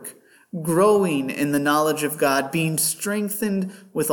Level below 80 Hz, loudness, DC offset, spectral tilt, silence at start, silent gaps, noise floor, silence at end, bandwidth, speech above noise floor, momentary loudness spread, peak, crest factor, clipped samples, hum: -68 dBFS; -21 LUFS; under 0.1%; -4.5 dB/octave; 0 s; none; -43 dBFS; 0 s; 19 kHz; 21 dB; 11 LU; -6 dBFS; 16 dB; under 0.1%; none